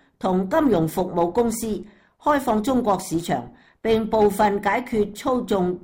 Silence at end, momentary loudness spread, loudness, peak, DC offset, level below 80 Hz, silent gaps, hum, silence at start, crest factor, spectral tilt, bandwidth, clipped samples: 0.05 s; 8 LU; -22 LUFS; -10 dBFS; under 0.1%; -48 dBFS; none; none; 0.2 s; 12 dB; -6 dB/octave; 17 kHz; under 0.1%